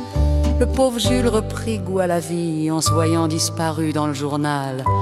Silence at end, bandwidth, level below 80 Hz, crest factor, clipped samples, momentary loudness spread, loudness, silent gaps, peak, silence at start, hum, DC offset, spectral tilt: 0 s; 15 kHz; -28 dBFS; 14 dB; under 0.1%; 5 LU; -20 LUFS; none; -4 dBFS; 0 s; none; under 0.1%; -5.5 dB/octave